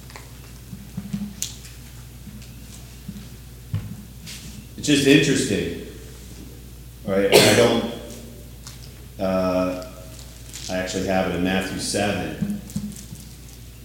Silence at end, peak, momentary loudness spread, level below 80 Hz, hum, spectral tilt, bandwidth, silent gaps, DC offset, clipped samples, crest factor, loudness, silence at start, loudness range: 0 s; 0 dBFS; 24 LU; -44 dBFS; 60 Hz at -50 dBFS; -4 dB/octave; 17 kHz; none; under 0.1%; under 0.1%; 24 dB; -21 LUFS; 0 s; 15 LU